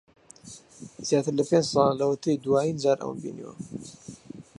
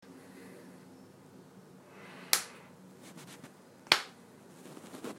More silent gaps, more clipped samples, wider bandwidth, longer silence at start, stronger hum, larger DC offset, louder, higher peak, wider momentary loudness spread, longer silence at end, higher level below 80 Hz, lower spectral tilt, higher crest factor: neither; neither; second, 11.5 kHz vs 16 kHz; first, 0.45 s vs 0 s; neither; neither; first, -25 LUFS vs -30 LUFS; second, -8 dBFS vs -2 dBFS; second, 22 LU vs 27 LU; first, 0.15 s vs 0 s; first, -64 dBFS vs -84 dBFS; first, -5.5 dB/octave vs -0.5 dB/octave; second, 18 dB vs 38 dB